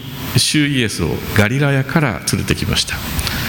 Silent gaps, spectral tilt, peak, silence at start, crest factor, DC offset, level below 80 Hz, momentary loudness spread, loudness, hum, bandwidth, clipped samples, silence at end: none; -4 dB/octave; 0 dBFS; 0 s; 16 dB; under 0.1%; -32 dBFS; 6 LU; -16 LUFS; none; 17.5 kHz; under 0.1%; 0 s